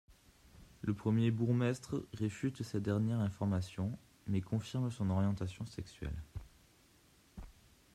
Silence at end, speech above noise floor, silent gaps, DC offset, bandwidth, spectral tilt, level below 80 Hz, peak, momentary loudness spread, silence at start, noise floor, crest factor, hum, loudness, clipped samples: 0.45 s; 31 dB; none; under 0.1%; 13.5 kHz; -7.5 dB/octave; -58 dBFS; -20 dBFS; 15 LU; 0.1 s; -67 dBFS; 16 dB; none; -37 LUFS; under 0.1%